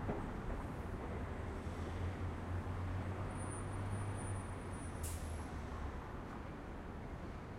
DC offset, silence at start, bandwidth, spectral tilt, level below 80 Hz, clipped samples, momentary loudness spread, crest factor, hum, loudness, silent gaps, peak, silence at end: under 0.1%; 0 s; 16 kHz; -6.5 dB/octave; -50 dBFS; under 0.1%; 6 LU; 14 dB; none; -45 LUFS; none; -28 dBFS; 0 s